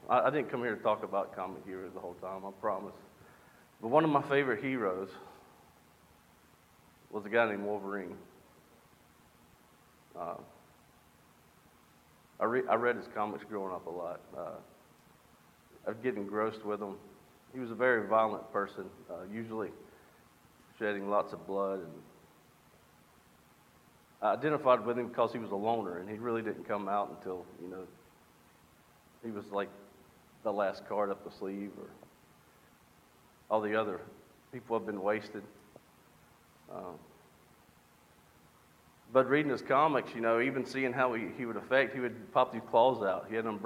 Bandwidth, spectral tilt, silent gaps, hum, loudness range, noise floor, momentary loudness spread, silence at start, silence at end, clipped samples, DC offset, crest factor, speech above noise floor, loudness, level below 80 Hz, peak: 16.5 kHz; -6.5 dB/octave; none; none; 11 LU; -63 dBFS; 18 LU; 0.05 s; 0 s; under 0.1%; under 0.1%; 24 dB; 30 dB; -34 LUFS; -76 dBFS; -12 dBFS